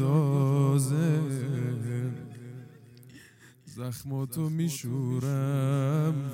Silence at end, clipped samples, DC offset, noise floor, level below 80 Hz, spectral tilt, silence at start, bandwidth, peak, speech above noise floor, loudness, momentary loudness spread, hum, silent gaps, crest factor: 0 s; under 0.1%; under 0.1%; -54 dBFS; -70 dBFS; -7.5 dB/octave; 0 s; 16.5 kHz; -14 dBFS; 26 dB; -28 LUFS; 16 LU; none; none; 14 dB